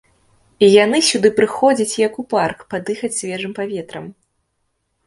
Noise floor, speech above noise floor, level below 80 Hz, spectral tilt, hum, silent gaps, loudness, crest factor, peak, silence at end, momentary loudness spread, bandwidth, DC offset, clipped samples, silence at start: -70 dBFS; 53 dB; -60 dBFS; -3.5 dB/octave; none; none; -16 LUFS; 18 dB; 0 dBFS; 0.95 s; 14 LU; 11.5 kHz; under 0.1%; under 0.1%; 0.6 s